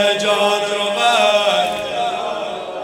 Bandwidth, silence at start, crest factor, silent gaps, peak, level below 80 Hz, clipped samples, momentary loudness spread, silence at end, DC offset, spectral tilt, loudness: 16.5 kHz; 0 s; 16 dB; none; -2 dBFS; -60 dBFS; under 0.1%; 10 LU; 0 s; under 0.1%; -2 dB/octave; -17 LUFS